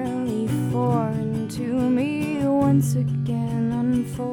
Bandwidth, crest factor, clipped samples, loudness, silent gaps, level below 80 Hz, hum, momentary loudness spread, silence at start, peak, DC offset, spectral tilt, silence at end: 16.5 kHz; 14 dB; under 0.1%; -23 LUFS; none; -50 dBFS; none; 6 LU; 0 s; -8 dBFS; under 0.1%; -8 dB/octave; 0 s